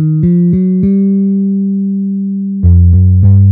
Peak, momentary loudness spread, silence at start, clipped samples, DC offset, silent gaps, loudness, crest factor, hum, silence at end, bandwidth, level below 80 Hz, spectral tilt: 0 dBFS; 8 LU; 0 s; 0.3%; under 0.1%; none; -10 LUFS; 8 dB; none; 0 s; 2.2 kHz; -22 dBFS; -15.5 dB/octave